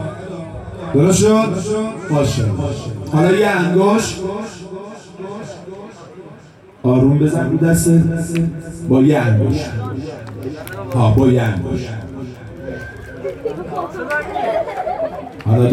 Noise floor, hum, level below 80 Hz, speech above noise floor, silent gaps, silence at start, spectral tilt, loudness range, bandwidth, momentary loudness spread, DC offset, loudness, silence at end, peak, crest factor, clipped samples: -42 dBFS; none; -40 dBFS; 27 dB; none; 0 s; -6.5 dB/octave; 8 LU; 15.5 kHz; 18 LU; under 0.1%; -16 LUFS; 0 s; -4 dBFS; 14 dB; under 0.1%